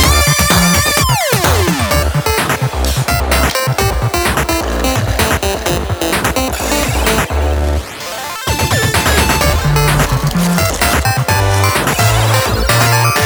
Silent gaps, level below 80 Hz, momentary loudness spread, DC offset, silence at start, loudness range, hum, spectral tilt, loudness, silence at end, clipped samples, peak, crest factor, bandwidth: none; -20 dBFS; 6 LU; under 0.1%; 0 s; 3 LU; none; -4 dB/octave; -13 LUFS; 0 s; under 0.1%; 0 dBFS; 12 dB; over 20 kHz